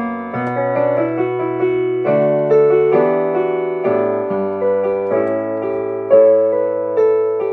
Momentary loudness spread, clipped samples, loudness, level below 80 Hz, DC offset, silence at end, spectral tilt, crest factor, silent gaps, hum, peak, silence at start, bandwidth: 8 LU; under 0.1%; -16 LUFS; -64 dBFS; under 0.1%; 0 s; -9.5 dB/octave; 14 dB; none; none; 0 dBFS; 0 s; 4.2 kHz